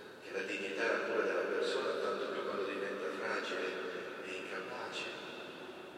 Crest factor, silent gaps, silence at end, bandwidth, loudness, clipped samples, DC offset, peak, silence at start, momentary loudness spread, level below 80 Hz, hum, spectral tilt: 16 dB; none; 0 s; 15.5 kHz; -38 LUFS; under 0.1%; under 0.1%; -22 dBFS; 0 s; 9 LU; -84 dBFS; none; -3.5 dB/octave